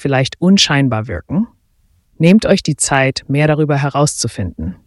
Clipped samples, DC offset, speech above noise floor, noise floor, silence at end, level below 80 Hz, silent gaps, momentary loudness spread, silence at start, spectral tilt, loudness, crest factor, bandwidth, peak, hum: under 0.1%; under 0.1%; 43 dB; -56 dBFS; 0.1 s; -40 dBFS; none; 10 LU; 0 s; -5 dB/octave; -14 LUFS; 14 dB; 12 kHz; 0 dBFS; none